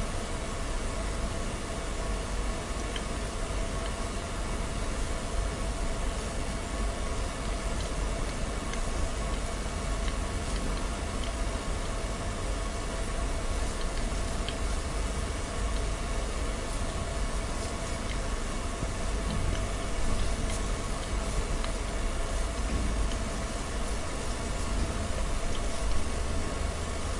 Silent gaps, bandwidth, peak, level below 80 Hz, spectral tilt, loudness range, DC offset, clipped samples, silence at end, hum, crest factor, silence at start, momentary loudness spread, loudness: none; 11.5 kHz; -16 dBFS; -32 dBFS; -4.5 dB/octave; 1 LU; under 0.1%; under 0.1%; 0 s; none; 16 dB; 0 s; 2 LU; -34 LUFS